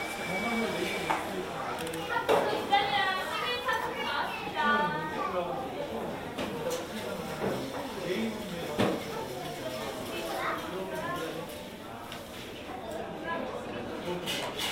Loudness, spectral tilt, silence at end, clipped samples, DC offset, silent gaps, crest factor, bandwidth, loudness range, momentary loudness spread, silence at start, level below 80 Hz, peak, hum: -32 LUFS; -4 dB/octave; 0 s; under 0.1%; under 0.1%; none; 20 dB; 16 kHz; 8 LU; 11 LU; 0 s; -58 dBFS; -12 dBFS; none